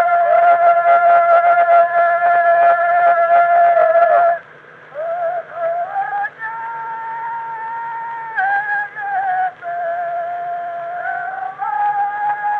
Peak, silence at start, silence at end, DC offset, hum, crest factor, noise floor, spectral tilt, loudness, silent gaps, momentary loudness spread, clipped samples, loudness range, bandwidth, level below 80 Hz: -2 dBFS; 0 s; 0 s; under 0.1%; none; 14 dB; -41 dBFS; -5 dB/octave; -16 LUFS; none; 14 LU; under 0.1%; 11 LU; 4.1 kHz; -74 dBFS